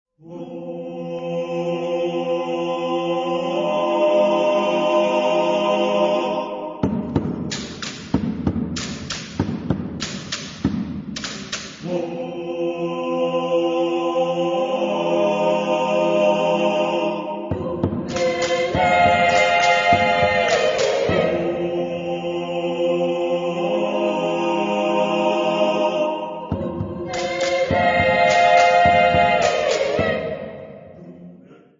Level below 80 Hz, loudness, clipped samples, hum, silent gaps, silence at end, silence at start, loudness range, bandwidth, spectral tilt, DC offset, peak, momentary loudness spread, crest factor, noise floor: -48 dBFS; -20 LUFS; under 0.1%; none; none; 0.25 s; 0.25 s; 9 LU; 7.6 kHz; -5 dB/octave; under 0.1%; -2 dBFS; 13 LU; 18 dB; -46 dBFS